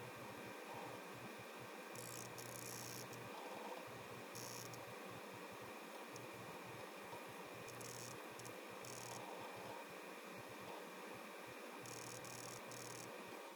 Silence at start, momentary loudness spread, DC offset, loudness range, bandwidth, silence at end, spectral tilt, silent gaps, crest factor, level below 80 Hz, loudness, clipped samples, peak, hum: 0 s; 3 LU; under 0.1%; 1 LU; 19 kHz; 0 s; -3 dB/octave; none; 18 dB; -86 dBFS; -52 LUFS; under 0.1%; -34 dBFS; none